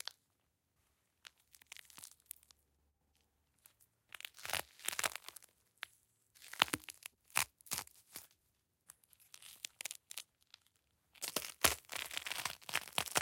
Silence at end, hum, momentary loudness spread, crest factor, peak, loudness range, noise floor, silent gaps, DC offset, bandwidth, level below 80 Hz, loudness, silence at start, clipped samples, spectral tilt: 0 s; none; 23 LU; 42 dB; -4 dBFS; 18 LU; -82 dBFS; none; under 0.1%; 17 kHz; -70 dBFS; -40 LUFS; 0.05 s; under 0.1%; -0.5 dB/octave